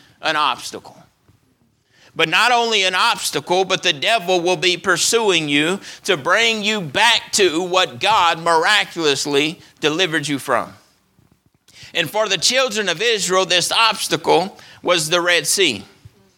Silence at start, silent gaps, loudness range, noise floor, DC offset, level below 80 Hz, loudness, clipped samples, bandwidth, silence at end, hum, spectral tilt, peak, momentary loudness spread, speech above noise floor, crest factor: 0.2 s; none; 4 LU; -60 dBFS; under 0.1%; -64 dBFS; -16 LUFS; under 0.1%; 19 kHz; 0.55 s; none; -2 dB/octave; 0 dBFS; 7 LU; 43 dB; 18 dB